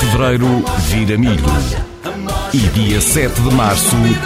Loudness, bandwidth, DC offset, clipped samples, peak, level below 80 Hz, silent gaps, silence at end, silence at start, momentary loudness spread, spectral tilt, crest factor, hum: -14 LUFS; 16 kHz; under 0.1%; under 0.1%; 0 dBFS; -22 dBFS; none; 0 s; 0 s; 9 LU; -5 dB/octave; 14 dB; none